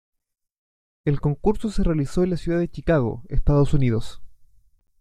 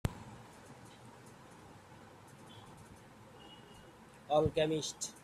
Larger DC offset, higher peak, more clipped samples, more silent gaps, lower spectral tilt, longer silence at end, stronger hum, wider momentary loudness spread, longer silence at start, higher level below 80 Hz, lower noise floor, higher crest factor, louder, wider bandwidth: neither; first, -6 dBFS vs -14 dBFS; neither; neither; first, -8.5 dB/octave vs -4.5 dB/octave; first, 0.65 s vs 0.05 s; neither; second, 7 LU vs 24 LU; first, 1.05 s vs 0.05 s; first, -32 dBFS vs -60 dBFS; second, -50 dBFS vs -57 dBFS; second, 16 dB vs 26 dB; first, -23 LUFS vs -34 LUFS; second, 11 kHz vs 14.5 kHz